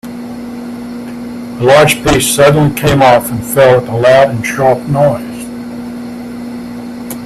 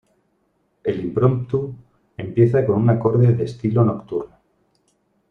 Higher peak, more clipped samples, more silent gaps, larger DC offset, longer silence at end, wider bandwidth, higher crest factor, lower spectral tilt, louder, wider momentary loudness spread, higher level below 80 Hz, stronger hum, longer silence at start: about the same, 0 dBFS vs -2 dBFS; neither; neither; neither; second, 0 s vs 1.05 s; first, 15.5 kHz vs 4.9 kHz; second, 12 dB vs 18 dB; second, -5 dB/octave vs -10.5 dB/octave; first, -9 LUFS vs -19 LUFS; first, 17 LU vs 14 LU; first, -36 dBFS vs -52 dBFS; first, 60 Hz at -25 dBFS vs none; second, 0.05 s vs 0.85 s